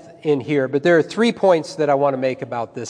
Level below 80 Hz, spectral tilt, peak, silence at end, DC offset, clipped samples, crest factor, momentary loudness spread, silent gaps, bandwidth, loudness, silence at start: -70 dBFS; -6 dB/octave; -2 dBFS; 0 s; under 0.1%; under 0.1%; 16 dB; 7 LU; none; 10.5 kHz; -19 LUFS; 0.05 s